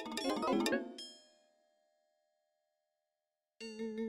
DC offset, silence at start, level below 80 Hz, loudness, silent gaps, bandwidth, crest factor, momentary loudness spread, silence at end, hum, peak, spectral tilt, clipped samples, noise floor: under 0.1%; 0 s; -76 dBFS; -37 LUFS; none; 16 kHz; 24 dB; 17 LU; 0 s; none; -18 dBFS; -3.5 dB/octave; under 0.1%; under -90 dBFS